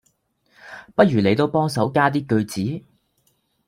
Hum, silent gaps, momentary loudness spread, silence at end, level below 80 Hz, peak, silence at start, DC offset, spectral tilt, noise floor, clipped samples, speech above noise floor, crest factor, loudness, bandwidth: none; none; 16 LU; 0.9 s; -58 dBFS; -2 dBFS; 0.65 s; under 0.1%; -6.5 dB/octave; -66 dBFS; under 0.1%; 47 dB; 20 dB; -20 LUFS; 16 kHz